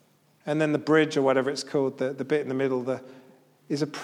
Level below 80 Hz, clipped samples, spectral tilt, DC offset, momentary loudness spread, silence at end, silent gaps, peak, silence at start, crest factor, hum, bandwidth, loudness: -82 dBFS; under 0.1%; -5.5 dB/octave; under 0.1%; 10 LU; 0 s; none; -10 dBFS; 0.45 s; 18 dB; none; 12 kHz; -26 LUFS